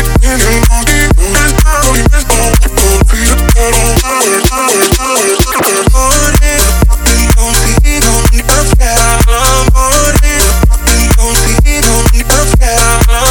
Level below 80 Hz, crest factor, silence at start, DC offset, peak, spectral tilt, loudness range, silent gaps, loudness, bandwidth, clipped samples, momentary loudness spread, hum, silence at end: -10 dBFS; 6 dB; 0 s; under 0.1%; 0 dBFS; -3.5 dB/octave; 0 LU; none; -8 LUFS; over 20 kHz; 0.6%; 1 LU; none; 0 s